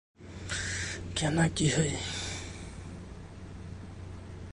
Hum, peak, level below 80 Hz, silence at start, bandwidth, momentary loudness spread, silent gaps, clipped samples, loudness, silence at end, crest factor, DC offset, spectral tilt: none; -14 dBFS; -48 dBFS; 0.2 s; 11.5 kHz; 18 LU; none; under 0.1%; -31 LUFS; 0 s; 20 dB; under 0.1%; -4 dB/octave